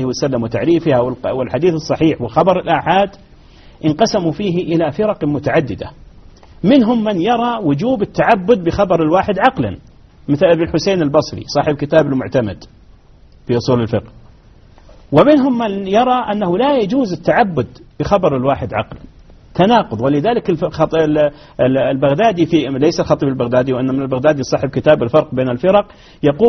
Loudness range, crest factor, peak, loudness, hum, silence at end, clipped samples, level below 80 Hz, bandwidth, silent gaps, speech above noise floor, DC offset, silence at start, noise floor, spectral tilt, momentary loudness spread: 3 LU; 14 dB; 0 dBFS; -15 LUFS; none; 0 s; under 0.1%; -42 dBFS; 6.4 kHz; none; 30 dB; under 0.1%; 0 s; -44 dBFS; -5.5 dB/octave; 7 LU